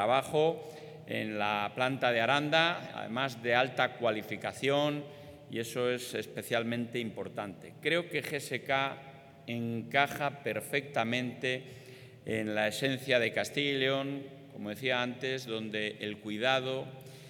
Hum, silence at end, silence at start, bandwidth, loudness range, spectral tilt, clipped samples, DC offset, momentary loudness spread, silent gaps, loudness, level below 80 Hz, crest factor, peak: none; 0 s; 0 s; 19 kHz; 4 LU; -4.5 dB/octave; under 0.1%; under 0.1%; 13 LU; none; -32 LUFS; -78 dBFS; 22 dB; -10 dBFS